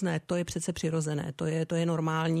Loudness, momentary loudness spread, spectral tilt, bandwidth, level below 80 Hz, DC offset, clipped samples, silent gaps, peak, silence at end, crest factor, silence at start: -31 LUFS; 4 LU; -6 dB/octave; 13 kHz; -58 dBFS; under 0.1%; under 0.1%; none; -16 dBFS; 0 s; 12 dB; 0 s